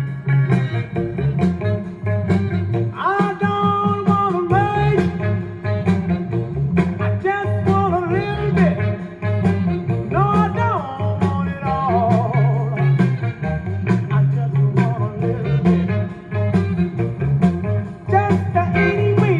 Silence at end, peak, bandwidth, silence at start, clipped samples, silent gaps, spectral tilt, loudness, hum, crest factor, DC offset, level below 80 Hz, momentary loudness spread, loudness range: 0 s; -2 dBFS; 7.6 kHz; 0 s; under 0.1%; none; -9 dB/octave; -19 LUFS; none; 16 dB; under 0.1%; -42 dBFS; 6 LU; 2 LU